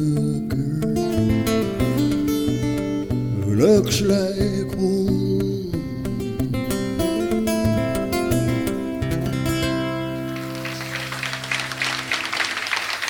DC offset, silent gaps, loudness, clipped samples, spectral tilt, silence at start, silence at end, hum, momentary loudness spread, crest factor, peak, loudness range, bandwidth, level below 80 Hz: under 0.1%; none; -22 LUFS; under 0.1%; -5.5 dB/octave; 0 s; 0 s; none; 7 LU; 18 dB; -4 dBFS; 4 LU; over 20 kHz; -38 dBFS